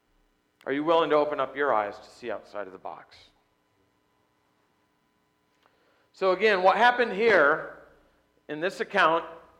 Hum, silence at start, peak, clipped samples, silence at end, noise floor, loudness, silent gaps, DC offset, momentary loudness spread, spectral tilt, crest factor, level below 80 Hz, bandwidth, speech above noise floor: none; 0.65 s; -8 dBFS; under 0.1%; 0.2 s; -70 dBFS; -24 LUFS; none; under 0.1%; 20 LU; -4.5 dB/octave; 20 dB; -70 dBFS; 11 kHz; 46 dB